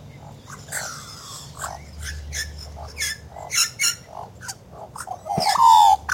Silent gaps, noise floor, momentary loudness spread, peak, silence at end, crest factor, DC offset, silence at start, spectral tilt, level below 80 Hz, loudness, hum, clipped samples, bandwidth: none; -41 dBFS; 24 LU; -4 dBFS; 0 s; 18 dB; under 0.1%; 0 s; -1 dB/octave; -44 dBFS; -20 LUFS; none; under 0.1%; 16.5 kHz